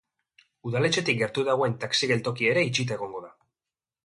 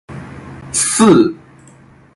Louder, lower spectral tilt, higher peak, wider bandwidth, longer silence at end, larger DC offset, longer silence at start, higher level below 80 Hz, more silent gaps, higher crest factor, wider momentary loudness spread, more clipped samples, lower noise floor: second, -25 LUFS vs -12 LUFS; about the same, -4.5 dB/octave vs -4 dB/octave; second, -10 dBFS vs 0 dBFS; about the same, 11.5 kHz vs 12 kHz; about the same, 0.75 s vs 0.8 s; neither; first, 0.65 s vs 0.1 s; second, -66 dBFS vs -48 dBFS; neither; about the same, 18 dB vs 16 dB; second, 11 LU vs 23 LU; neither; first, under -90 dBFS vs -44 dBFS